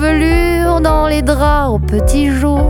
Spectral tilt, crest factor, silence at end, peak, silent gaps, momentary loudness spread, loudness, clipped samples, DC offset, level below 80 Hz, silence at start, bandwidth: -6.5 dB/octave; 12 dB; 0 s; 0 dBFS; none; 2 LU; -13 LUFS; under 0.1%; under 0.1%; -16 dBFS; 0 s; 17 kHz